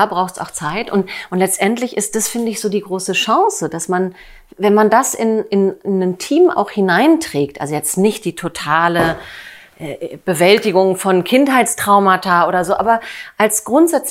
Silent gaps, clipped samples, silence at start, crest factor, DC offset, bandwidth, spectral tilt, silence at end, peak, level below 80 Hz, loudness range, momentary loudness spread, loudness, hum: none; under 0.1%; 0 s; 16 dB; under 0.1%; 16 kHz; -4 dB/octave; 0 s; 0 dBFS; -52 dBFS; 4 LU; 10 LU; -15 LUFS; none